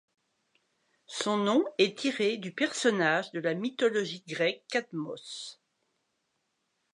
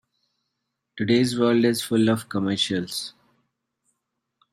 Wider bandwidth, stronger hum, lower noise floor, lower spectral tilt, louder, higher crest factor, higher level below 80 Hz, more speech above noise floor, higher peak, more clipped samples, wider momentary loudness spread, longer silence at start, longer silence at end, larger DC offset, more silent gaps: second, 11 kHz vs 15 kHz; neither; about the same, -79 dBFS vs -80 dBFS; about the same, -4 dB/octave vs -5 dB/octave; second, -29 LUFS vs -22 LUFS; about the same, 20 dB vs 18 dB; second, -84 dBFS vs -66 dBFS; second, 49 dB vs 58 dB; second, -12 dBFS vs -8 dBFS; neither; about the same, 13 LU vs 11 LU; first, 1.1 s vs 0.95 s; about the same, 1.4 s vs 1.4 s; neither; neither